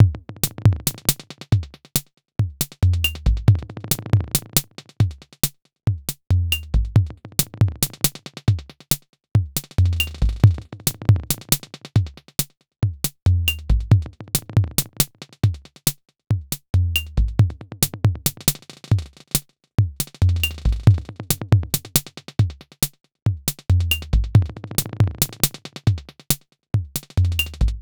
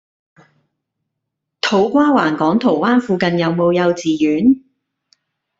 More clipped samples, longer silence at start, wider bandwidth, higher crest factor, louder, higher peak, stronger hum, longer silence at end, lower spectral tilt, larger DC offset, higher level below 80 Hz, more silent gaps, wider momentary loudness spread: neither; second, 0 s vs 1.65 s; first, over 20 kHz vs 7.8 kHz; about the same, 20 dB vs 16 dB; second, -22 LUFS vs -15 LUFS; about the same, 0 dBFS vs -2 dBFS; neither; second, 0 s vs 1 s; second, -4 dB/octave vs -6 dB/octave; neither; first, -30 dBFS vs -58 dBFS; first, 9.09-9.13 s, 13.22-13.26 s, 23.22-23.26 s vs none; about the same, 6 LU vs 4 LU